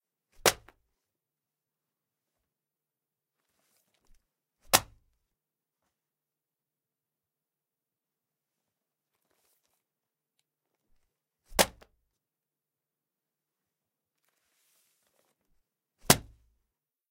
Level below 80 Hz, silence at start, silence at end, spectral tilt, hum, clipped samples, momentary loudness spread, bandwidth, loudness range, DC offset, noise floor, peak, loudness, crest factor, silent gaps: -60 dBFS; 0.45 s; 0.9 s; -2 dB/octave; none; under 0.1%; 5 LU; 16 kHz; 2 LU; under 0.1%; under -90 dBFS; 0 dBFS; -27 LUFS; 38 dB; none